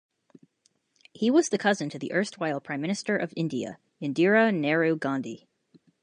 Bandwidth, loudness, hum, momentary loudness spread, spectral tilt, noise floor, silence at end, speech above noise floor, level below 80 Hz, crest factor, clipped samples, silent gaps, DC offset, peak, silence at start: 10.5 kHz; -26 LUFS; none; 12 LU; -5 dB/octave; -71 dBFS; 0.65 s; 45 dB; -78 dBFS; 20 dB; under 0.1%; none; under 0.1%; -8 dBFS; 1.2 s